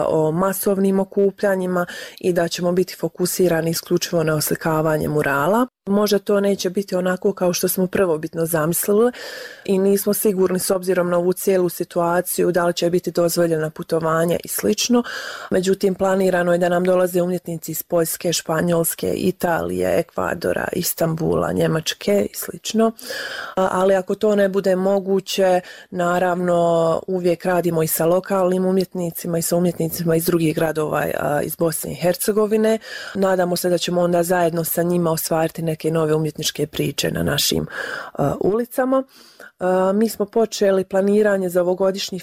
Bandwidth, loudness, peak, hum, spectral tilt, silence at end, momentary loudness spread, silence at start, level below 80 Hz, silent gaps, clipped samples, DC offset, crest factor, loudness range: 16.5 kHz; -20 LUFS; -8 dBFS; none; -5 dB/octave; 0 s; 5 LU; 0 s; -52 dBFS; none; under 0.1%; under 0.1%; 12 dB; 2 LU